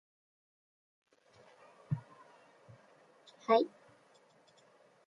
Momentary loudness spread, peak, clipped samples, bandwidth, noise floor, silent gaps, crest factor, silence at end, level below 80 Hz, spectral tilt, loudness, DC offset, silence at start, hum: 17 LU; -14 dBFS; under 0.1%; 10 kHz; -66 dBFS; none; 26 dB; 1.4 s; -78 dBFS; -7.5 dB/octave; -34 LUFS; under 0.1%; 1.9 s; none